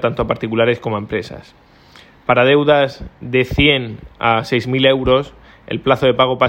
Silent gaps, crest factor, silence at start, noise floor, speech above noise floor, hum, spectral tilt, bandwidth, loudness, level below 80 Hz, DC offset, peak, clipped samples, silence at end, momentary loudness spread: none; 16 dB; 0 s; -45 dBFS; 29 dB; none; -6.5 dB/octave; 16.5 kHz; -16 LUFS; -38 dBFS; under 0.1%; 0 dBFS; under 0.1%; 0 s; 14 LU